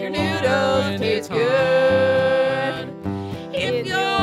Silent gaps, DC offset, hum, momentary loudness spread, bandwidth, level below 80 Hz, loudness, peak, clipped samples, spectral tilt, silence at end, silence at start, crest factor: none; under 0.1%; none; 11 LU; 13.5 kHz; -52 dBFS; -20 LUFS; -8 dBFS; under 0.1%; -5.5 dB/octave; 0 s; 0 s; 12 dB